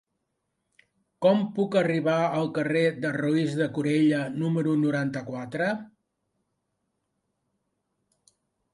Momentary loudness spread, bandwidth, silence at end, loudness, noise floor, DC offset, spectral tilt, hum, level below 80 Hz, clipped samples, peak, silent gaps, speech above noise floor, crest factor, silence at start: 6 LU; 11.5 kHz; 2.85 s; -26 LUFS; -79 dBFS; under 0.1%; -7 dB/octave; none; -72 dBFS; under 0.1%; -8 dBFS; none; 54 dB; 18 dB; 1.2 s